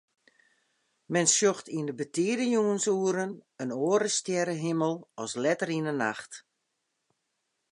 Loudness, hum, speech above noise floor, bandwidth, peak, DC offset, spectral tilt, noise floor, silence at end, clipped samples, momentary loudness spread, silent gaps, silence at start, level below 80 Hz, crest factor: -28 LUFS; none; 52 dB; 11.5 kHz; -10 dBFS; under 0.1%; -3.5 dB/octave; -80 dBFS; 1.35 s; under 0.1%; 12 LU; none; 1.1 s; -82 dBFS; 20 dB